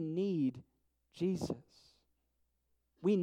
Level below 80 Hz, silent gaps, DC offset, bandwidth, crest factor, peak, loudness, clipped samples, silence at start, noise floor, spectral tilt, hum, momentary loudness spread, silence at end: -72 dBFS; none; under 0.1%; 12.5 kHz; 16 dB; -22 dBFS; -37 LUFS; under 0.1%; 0 s; -80 dBFS; -8 dB/octave; none; 10 LU; 0 s